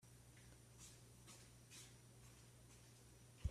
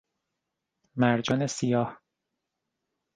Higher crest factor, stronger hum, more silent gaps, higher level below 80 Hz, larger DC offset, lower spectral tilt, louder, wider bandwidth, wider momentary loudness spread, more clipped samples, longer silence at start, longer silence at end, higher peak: about the same, 26 dB vs 22 dB; neither; neither; about the same, -62 dBFS vs -66 dBFS; neither; second, -4 dB/octave vs -5.5 dB/octave; second, -62 LUFS vs -27 LUFS; first, 15 kHz vs 9.8 kHz; second, 5 LU vs 9 LU; neither; second, 0 s vs 0.95 s; second, 0 s vs 1.2 s; second, -32 dBFS vs -8 dBFS